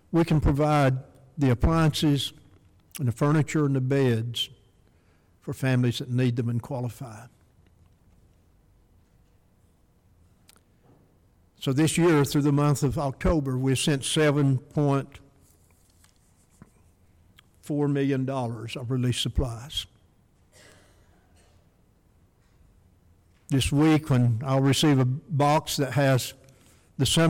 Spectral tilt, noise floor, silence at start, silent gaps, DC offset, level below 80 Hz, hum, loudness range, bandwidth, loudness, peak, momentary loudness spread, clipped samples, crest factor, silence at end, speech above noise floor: -6 dB/octave; -62 dBFS; 0.1 s; none; under 0.1%; -44 dBFS; none; 10 LU; 16.5 kHz; -25 LUFS; -14 dBFS; 12 LU; under 0.1%; 12 dB; 0 s; 38 dB